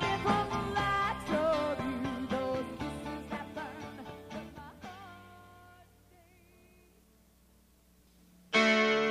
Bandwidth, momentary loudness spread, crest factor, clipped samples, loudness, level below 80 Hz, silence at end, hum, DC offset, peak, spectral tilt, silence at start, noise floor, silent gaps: 15.5 kHz; 21 LU; 20 dB; under 0.1%; -32 LUFS; -56 dBFS; 0 s; none; under 0.1%; -16 dBFS; -5 dB/octave; 0 s; -64 dBFS; none